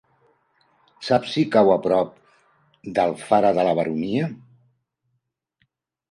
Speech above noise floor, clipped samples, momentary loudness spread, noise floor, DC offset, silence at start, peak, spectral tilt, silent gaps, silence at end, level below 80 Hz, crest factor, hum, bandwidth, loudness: 55 dB; under 0.1%; 13 LU; -75 dBFS; under 0.1%; 1 s; -4 dBFS; -6.5 dB/octave; none; 1.75 s; -62 dBFS; 20 dB; none; 11.5 kHz; -21 LUFS